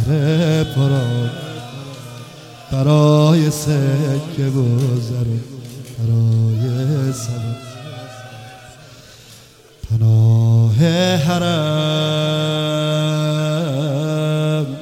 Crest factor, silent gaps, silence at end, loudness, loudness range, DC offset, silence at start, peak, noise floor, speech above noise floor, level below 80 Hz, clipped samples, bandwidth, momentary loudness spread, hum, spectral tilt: 16 dB; none; 0 s; -17 LUFS; 6 LU; under 0.1%; 0 s; -2 dBFS; -44 dBFS; 29 dB; -46 dBFS; under 0.1%; 15.5 kHz; 19 LU; none; -6.5 dB/octave